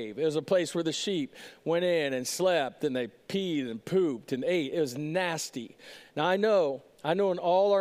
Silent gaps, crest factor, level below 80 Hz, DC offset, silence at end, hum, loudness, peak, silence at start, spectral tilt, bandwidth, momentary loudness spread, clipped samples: none; 16 dB; -78 dBFS; under 0.1%; 0 s; none; -29 LUFS; -12 dBFS; 0 s; -4.5 dB/octave; 15.5 kHz; 10 LU; under 0.1%